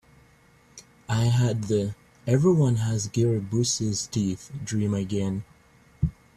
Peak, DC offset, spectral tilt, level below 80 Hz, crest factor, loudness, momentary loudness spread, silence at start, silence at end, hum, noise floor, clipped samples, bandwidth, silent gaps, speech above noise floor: -10 dBFS; under 0.1%; -6 dB/octave; -50 dBFS; 16 dB; -25 LUFS; 10 LU; 0.75 s; 0.25 s; none; -57 dBFS; under 0.1%; 13 kHz; none; 33 dB